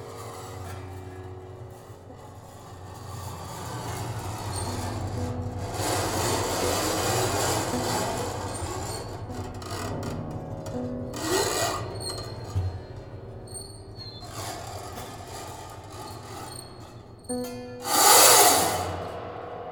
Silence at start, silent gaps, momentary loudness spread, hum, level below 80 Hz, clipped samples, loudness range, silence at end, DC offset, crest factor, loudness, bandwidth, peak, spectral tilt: 0 s; none; 17 LU; none; -48 dBFS; under 0.1%; 18 LU; 0 s; under 0.1%; 26 dB; -25 LUFS; 19 kHz; -2 dBFS; -2.5 dB/octave